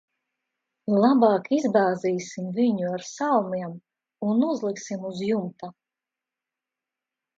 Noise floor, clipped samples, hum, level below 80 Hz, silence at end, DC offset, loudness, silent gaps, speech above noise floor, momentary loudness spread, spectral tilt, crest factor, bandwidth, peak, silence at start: -89 dBFS; under 0.1%; none; -76 dBFS; 1.65 s; under 0.1%; -24 LUFS; none; 65 dB; 13 LU; -6.5 dB/octave; 20 dB; 7.8 kHz; -6 dBFS; 0.85 s